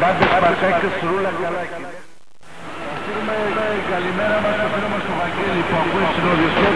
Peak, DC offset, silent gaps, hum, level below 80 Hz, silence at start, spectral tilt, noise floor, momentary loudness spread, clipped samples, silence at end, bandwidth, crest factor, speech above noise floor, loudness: -2 dBFS; 2%; none; none; -46 dBFS; 0 s; -6 dB/octave; -47 dBFS; 13 LU; under 0.1%; 0 s; 11 kHz; 18 dB; 28 dB; -19 LUFS